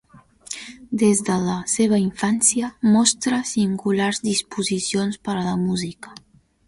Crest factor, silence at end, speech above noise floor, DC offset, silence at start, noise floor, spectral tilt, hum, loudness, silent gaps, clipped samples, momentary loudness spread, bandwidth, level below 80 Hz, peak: 18 dB; 0.55 s; 19 dB; under 0.1%; 0.5 s; -40 dBFS; -4 dB/octave; none; -20 LUFS; none; under 0.1%; 15 LU; 11.5 kHz; -56 dBFS; -4 dBFS